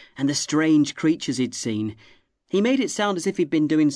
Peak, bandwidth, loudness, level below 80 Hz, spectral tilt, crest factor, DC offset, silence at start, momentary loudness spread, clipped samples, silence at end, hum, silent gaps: -10 dBFS; 11 kHz; -22 LUFS; -66 dBFS; -4.5 dB/octave; 12 dB; under 0.1%; 0.15 s; 7 LU; under 0.1%; 0 s; none; none